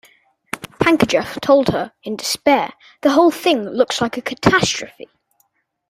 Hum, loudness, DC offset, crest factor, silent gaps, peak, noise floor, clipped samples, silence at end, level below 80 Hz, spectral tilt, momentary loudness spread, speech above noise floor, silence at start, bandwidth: none; -17 LUFS; under 0.1%; 18 dB; none; 0 dBFS; -64 dBFS; under 0.1%; 1 s; -48 dBFS; -4 dB/octave; 13 LU; 47 dB; 0.55 s; 16 kHz